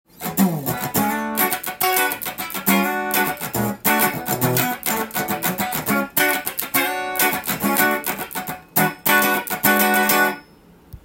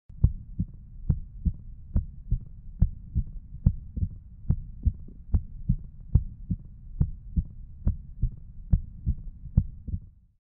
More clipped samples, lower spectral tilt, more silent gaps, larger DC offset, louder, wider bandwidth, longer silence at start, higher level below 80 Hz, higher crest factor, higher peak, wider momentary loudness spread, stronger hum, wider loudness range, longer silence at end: neither; second, -3 dB/octave vs -15 dB/octave; neither; neither; first, -19 LUFS vs -32 LUFS; first, 17 kHz vs 1.7 kHz; about the same, 0.2 s vs 0.1 s; second, -54 dBFS vs -32 dBFS; about the same, 20 dB vs 24 dB; first, 0 dBFS vs -6 dBFS; second, 7 LU vs 10 LU; neither; about the same, 2 LU vs 2 LU; second, 0.1 s vs 0.35 s